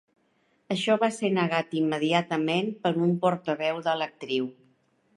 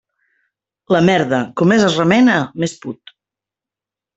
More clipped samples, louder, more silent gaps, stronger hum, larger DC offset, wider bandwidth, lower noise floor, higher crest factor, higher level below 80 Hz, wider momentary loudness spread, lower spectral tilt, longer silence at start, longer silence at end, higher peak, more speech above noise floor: neither; second, -27 LUFS vs -14 LUFS; neither; neither; neither; first, 11.5 kHz vs 8.2 kHz; second, -69 dBFS vs -88 dBFS; about the same, 20 dB vs 16 dB; second, -76 dBFS vs -56 dBFS; second, 6 LU vs 16 LU; about the same, -6 dB/octave vs -6 dB/octave; second, 0.7 s vs 0.9 s; second, 0.65 s vs 1.25 s; second, -8 dBFS vs -2 dBFS; second, 43 dB vs 74 dB